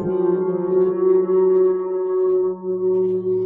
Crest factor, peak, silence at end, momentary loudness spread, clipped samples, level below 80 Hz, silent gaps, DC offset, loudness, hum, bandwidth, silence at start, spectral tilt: 10 dB; -8 dBFS; 0 s; 6 LU; under 0.1%; -62 dBFS; none; under 0.1%; -19 LUFS; none; 2.2 kHz; 0 s; -12.5 dB/octave